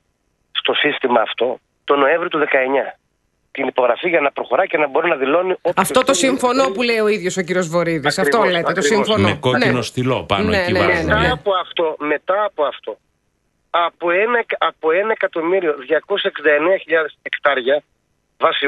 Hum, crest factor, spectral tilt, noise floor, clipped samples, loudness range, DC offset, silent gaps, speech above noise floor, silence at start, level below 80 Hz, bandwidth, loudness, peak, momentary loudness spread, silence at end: none; 18 dB; -4 dB/octave; -66 dBFS; under 0.1%; 3 LU; under 0.1%; none; 49 dB; 0.55 s; -46 dBFS; 12 kHz; -17 LUFS; 0 dBFS; 6 LU; 0 s